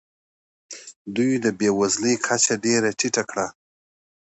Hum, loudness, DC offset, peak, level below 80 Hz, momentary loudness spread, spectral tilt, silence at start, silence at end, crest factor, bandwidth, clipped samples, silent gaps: none; -22 LUFS; under 0.1%; -4 dBFS; -64 dBFS; 18 LU; -3 dB/octave; 0.7 s; 0.85 s; 20 dB; 8.2 kHz; under 0.1%; 0.96-1.05 s